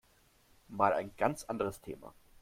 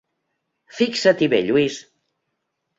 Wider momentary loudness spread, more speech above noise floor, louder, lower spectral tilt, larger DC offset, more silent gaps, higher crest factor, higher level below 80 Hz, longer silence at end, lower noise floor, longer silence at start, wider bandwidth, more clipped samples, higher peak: about the same, 17 LU vs 15 LU; second, 33 dB vs 58 dB; second, -34 LUFS vs -19 LUFS; about the same, -5.5 dB/octave vs -4.5 dB/octave; neither; neither; about the same, 24 dB vs 20 dB; about the same, -64 dBFS vs -64 dBFS; second, 0.3 s vs 1 s; second, -67 dBFS vs -76 dBFS; about the same, 0.7 s vs 0.75 s; first, 16.5 kHz vs 8 kHz; neither; second, -12 dBFS vs -2 dBFS